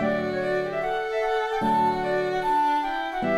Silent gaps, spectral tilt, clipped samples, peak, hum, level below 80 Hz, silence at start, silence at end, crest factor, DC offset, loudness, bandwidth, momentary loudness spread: none; -6 dB/octave; under 0.1%; -12 dBFS; none; -52 dBFS; 0 s; 0 s; 12 dB; under 0.1%; -25 LUFS; 15 kHz; 5 LU